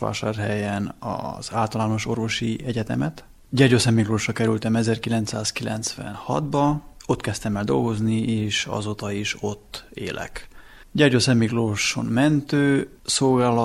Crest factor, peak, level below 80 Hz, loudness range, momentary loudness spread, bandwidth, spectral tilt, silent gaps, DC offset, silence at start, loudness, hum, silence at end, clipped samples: 18 dB; -4 dBFS; -48 dBFS; 4 LU; 11 LU; 14.5 kHz; -5 dB/octave; none; under 0.1%; 0 s; -23 LUFS; none; 0 s; under 0.1%